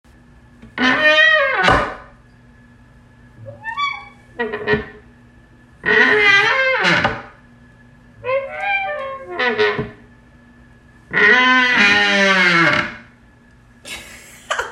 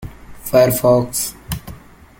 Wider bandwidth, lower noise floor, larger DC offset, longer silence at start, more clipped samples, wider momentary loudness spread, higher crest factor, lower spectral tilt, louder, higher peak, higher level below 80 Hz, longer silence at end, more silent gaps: second, 13.5 kHz vs 17 kHz; first, -48 dBFS vs -39 dBFS; neither; first, 0.65 s vs 0 s; neither; about the same, 20 LU vs 18 LU; about the same, 18 dB vs 18 dB; second, -3.5 dB/octave vs -5 dB/octave; about the same, -14 LUFS vs -16 LUFS; about the same, 0 dBFS vs -2 dBFS; about the same, -44 dBFS vs -40 dBFS; second, 0 s vs 0.4 s; neither